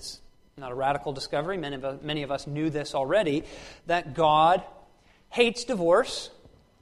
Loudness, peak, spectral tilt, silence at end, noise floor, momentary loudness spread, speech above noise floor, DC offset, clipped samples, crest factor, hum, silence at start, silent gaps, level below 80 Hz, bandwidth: -26 LUFS; -8 dBFS; -4.5 dB/octave; 0.5 s; -58 dBFS; 16 LU; 31 dB; under 0.1%; under 0.1%; 20 dB; none; 0 s; none; -54 dBFS; 13 kHz